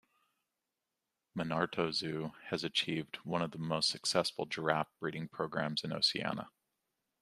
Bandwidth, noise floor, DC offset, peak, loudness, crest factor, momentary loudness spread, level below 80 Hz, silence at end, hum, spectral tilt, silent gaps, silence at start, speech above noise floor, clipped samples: 14.5 kHz; -88 dBFS; under 0.1%; -12 dBFS; -35 LUFS; 26 dB; 9 LU; -74 dBFS; 0.7 s; none; -4 dB/octave; none; 1.35 s; 52 dB; under 0.1%